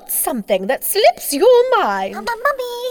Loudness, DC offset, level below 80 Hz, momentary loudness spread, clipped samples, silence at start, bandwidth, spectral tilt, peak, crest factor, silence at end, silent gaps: -16 LUFS; under 0.1%; -52 dBFS; 9 LU; under 0.1%; 0.05 s; over 20 kHz; -2.5 dB/octave; -4 dBFS; 14 dB; 0 s; none